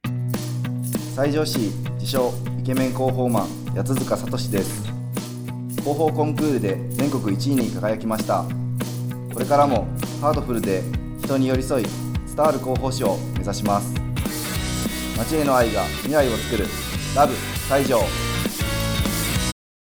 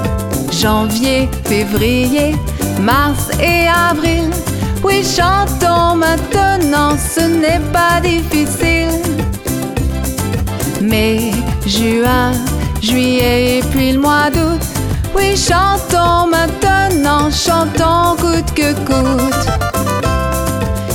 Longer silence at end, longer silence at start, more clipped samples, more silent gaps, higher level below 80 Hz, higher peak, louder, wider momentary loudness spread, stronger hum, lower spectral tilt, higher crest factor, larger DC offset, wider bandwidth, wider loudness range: first, 0.45 s vs 0 s; about the same, 0.05 s vs 0 s; neither; neither; second, -38 dBFS vs -24 dBFS; about the same, -4 dBFS vs -2 dBFS; second, -23 LUFS vs -13 LUFS; about the same, 8 LU vs 6 LU; neither; about the same, -5.5 dB/octave vs -4.5 dB/octave; first, 18 dB vs 12 dB; neither; about the same, over 20 kHz vs 19 kHz; about the same, 2 LU vs 3 LU